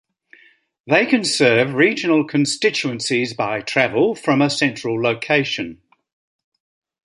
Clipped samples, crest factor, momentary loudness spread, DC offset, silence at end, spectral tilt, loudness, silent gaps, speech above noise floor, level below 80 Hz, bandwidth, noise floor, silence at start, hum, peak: under 0.1%; 18 dB; 7 LU; under 0.1%; 1.3 s; -4.5 dB/octave; -18 LUFS; none; 36 dB; -62 dBFS; 11.5 kHz; -54 dBFS; 0.85 s; none; -2 dBFS